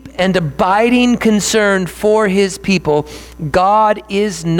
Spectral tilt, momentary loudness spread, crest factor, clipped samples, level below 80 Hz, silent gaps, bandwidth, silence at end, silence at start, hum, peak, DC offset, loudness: -5 dB/octave; 6 LU; 12 dB; under 0.1%; -40 dBFS; none; 18.5 kHz; 0 s; 0.05 s; none; -2 dBFS; under 0.1%; -13 LUFS